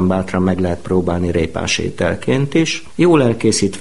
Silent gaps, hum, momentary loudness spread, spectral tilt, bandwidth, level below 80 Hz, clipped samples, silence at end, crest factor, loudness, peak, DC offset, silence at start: none; none; 6 LU; -5.5 dB/octave; 11.5 kHz; -38 dBFS; under 0.1%; 0 s; 14 dB; -16 LUFS; -2 dBFS; 3%; 0 s